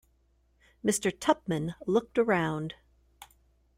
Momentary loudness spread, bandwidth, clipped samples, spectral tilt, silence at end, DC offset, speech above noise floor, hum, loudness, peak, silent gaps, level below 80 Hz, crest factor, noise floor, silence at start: 9 LU; 16 kHz; under 0.1%; -5 dB/octave; 0.55 s; under 0.1%; 40 dB; none; -29 LUFS; -10 dBFS; none; -62 dBFS; 22 dB; -68 dBFS; 0.85 s